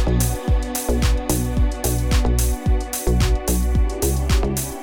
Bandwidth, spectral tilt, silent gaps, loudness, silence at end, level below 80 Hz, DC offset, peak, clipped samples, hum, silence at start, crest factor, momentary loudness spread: 19 kHz; -5 dB/octave; none; -21 LUFS; 0 s; -20 dBFS; under 0.1%; -4 dBFS; under 0.1%; none; 0 s; 16 dB; 3 LU